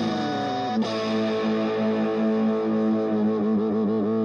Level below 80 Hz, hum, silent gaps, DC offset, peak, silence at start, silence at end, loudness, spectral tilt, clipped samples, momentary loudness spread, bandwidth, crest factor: -64 dBFS; none; none; under 0.1%; -14 dBFS; 0 s; 0 s; -24 LUFS; -7 dB/octave; under 0.1%; 3 LU; 7 kHz; 10 dB